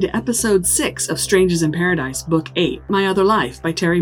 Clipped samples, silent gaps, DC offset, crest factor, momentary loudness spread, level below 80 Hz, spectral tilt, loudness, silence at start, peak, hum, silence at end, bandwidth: under 0.1%; none; under 0.1%; 16 dB; 5 LU; -42 dBFS; -4 dB/octave; -17 LUFS; 0 s; 0 dBFS; none; 0 s; 19.5 kHz